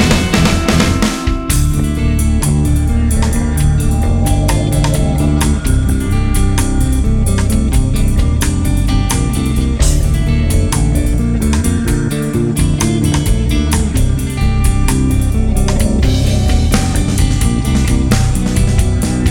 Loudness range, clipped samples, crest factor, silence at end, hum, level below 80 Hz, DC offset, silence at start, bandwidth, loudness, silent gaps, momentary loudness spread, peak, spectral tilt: 1 LU; under 0.1%; 12 dB; 0 s; none; -16 dBFS; under 0.1%; 0 s; 18.5 kHz; -14 LUFS; none; 2 LU; 0 dBFS; -5.5 dB/octave